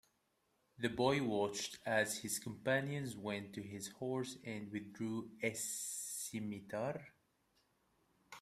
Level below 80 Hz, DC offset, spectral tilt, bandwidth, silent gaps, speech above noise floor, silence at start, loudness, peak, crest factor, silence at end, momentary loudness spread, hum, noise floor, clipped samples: -76 dBFS; under 0.1%; -4 dB/octave; 15.5 kHz; none; 40 dB; 0.8 s; -41 LUFS; -20 dBFS; 22 dB; 0 s; 10 LU; none; -80 dBFS; under 0.1%